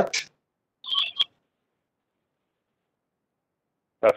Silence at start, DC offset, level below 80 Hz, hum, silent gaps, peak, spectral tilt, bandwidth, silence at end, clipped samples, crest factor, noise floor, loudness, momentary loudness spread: 0 s; under 0.1%; -70 dBFS; none; none; -8 dBFS; -1.5 dB/octave; 15.5 kHz; 0 s; under 0.1%; 24 dB; -82 dBFS; -26 LUFS; 16 LU